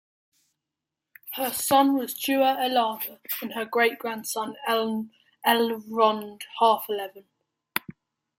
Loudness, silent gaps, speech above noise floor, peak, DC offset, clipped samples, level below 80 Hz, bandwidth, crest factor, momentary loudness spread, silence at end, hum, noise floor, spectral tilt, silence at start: -25 LUFS; none; 62 dB; -4 dBFS; under 0.1%; under 0.1%; -74 dBFS; 17 kHz; 22 dB; 11 LU; 0.5 s; none; -87 dBFS; -2.5 dB/octave; 1.25 s